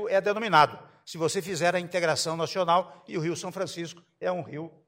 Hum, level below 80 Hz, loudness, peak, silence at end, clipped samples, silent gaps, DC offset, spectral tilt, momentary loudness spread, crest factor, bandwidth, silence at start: none; -72 dBFS; -27 LUFS; -6 dBFS; 0.2 s; under 0.1%; none; under 0.1%; -4 dB/octave; 15 LU; 22 dB; 16 kHz; 0 s